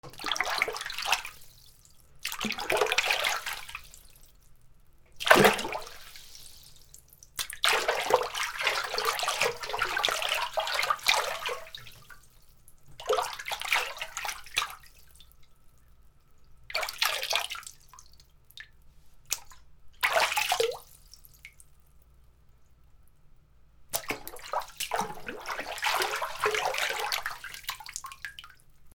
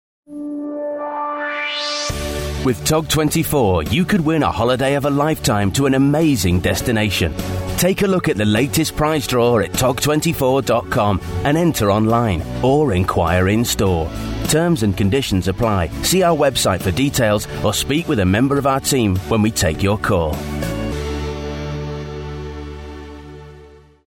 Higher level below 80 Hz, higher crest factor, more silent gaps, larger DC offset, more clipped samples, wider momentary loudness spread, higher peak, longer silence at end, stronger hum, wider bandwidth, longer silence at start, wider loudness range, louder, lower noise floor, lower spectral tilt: second, -58 dBFS vs -34 dBFS; first, 32 dB vs 14 dB; neither; neither; neither; first, 19 LU vs 10 LU; first, 0 dBFS vs -4 dBFS; second, 0.05 s vs 0.4 s; neither; first, over 20 kHz vs 16.5 kHz; second, 0.05 s vs 0.3 s; first, 8 LU vs 4 LU; second, -29 LUFS vs -17 LUFS; first, -57 dBFS vs -43 dBFS; second, -1 dB/octave vs -5 dB/octave